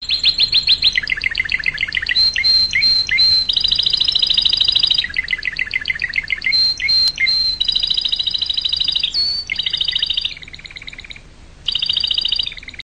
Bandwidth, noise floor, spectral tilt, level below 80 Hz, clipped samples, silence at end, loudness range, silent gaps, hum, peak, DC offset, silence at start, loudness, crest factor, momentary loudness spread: 11.5 kHz; -40 dBFS; 0 dB/octave; -40 dBFS; under 0.1%; 0 s; 6 LU; none; none; -4 dBFS; under 0.1%; 0 s; -14 LUFS; 14 dB; 8 LU